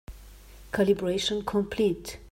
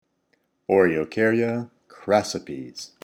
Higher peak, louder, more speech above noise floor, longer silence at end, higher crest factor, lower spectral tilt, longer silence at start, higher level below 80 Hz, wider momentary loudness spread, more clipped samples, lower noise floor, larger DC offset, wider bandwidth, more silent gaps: second, -10 dBFS vs -6 dBFS; second, -27 LUFS vs -22 LUFS; second, 21 dB vs 47 dB; about the same, 0.05 s vs 0.15 s; about the same, 18 dB vs 20 dB; about the same, -5 dB/octave vs -5.5 dB/octave; second, 0.1 s vs 0.7 s; first, -48 dBFS vs -62 dBFS; second, 7 LU vs 18 LU; neither; second, -48 dBFS vs -70 dBFS; neither; about the same, 16.5 kHz vs 15.5 kHz; neither